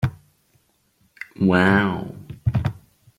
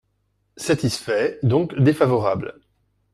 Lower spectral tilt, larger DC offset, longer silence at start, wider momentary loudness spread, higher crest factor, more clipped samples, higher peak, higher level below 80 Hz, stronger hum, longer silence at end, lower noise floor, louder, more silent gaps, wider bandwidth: first, -8 dB/octave vs -6.5 dB/octave; neither; second, 0 s vs 0.55 s; first, 20 LU vs 10 LU; about the same, 18 dB vs 18 dB; neither; about the same, -4 dBFS vs -4 dBFS; first, -46 dBFS vs -54 dBFS; neither; second, 0.45 s vs 0.6 s; second, -64 dBFS vs -69 dBFS; about the same, -21 LUFS vs -21 LUFS; neither; second, 10.5 kHz vs 13.5 kHz